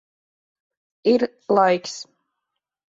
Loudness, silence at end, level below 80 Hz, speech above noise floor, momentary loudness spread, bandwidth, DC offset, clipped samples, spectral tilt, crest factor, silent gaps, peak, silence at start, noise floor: -20 LUFS; 0.95 s; -70 dBFS; 62 dB; 14 LU; 8 kHz; under 0.1%; under 0.1%; -5 dB/octave; 20 dB; none; -4 dBFS; 1.05 s; -82 dBFS